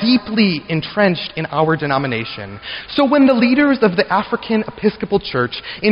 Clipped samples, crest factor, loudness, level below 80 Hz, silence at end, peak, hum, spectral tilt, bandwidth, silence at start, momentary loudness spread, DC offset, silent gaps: under 0.1%; 14 dB; -16 LUFS; -48 dBFS; 0 s; -2 dBFS; none; -8.5 dB/octave; 5.6 kHz; 0 s; 10 LU; under 0.1%; none